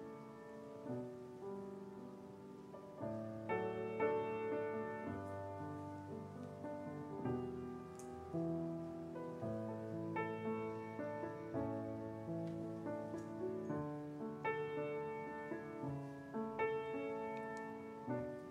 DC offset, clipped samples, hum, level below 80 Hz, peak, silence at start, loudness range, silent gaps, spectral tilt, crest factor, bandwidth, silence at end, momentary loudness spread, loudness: under 0.1%; under 0.1%; none; -74 dBFS; -26 dBFS; 0 s; 4 LU; none; -8 dB/octave; 18 dB; 14 kHz; 0 s; 10 LU; -45 LUFS